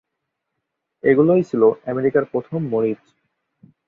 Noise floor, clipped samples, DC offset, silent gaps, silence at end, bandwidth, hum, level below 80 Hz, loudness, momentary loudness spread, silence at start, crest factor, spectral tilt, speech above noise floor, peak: -79 dBFS; under 0.1%; under 0.1%; none; 0.95 s; 6.8 kHz; none; -62 dBFS; -19 LUFS; 9 LU; 1.05 s; 18 dB; -10 dB/octave; 61 dB; -2 dBFS